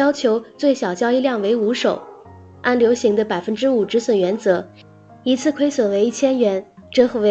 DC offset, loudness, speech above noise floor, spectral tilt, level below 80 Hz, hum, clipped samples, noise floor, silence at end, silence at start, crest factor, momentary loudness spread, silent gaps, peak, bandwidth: under 0.1%; -19 LUFS; 24 dB; -5 dB/octave; -62 dBFS; none; under 0.1%; -42 dBFS; 0 s; 0 s; 16 dB; 6 LU; none; -2 dBFS; 8.6 kHz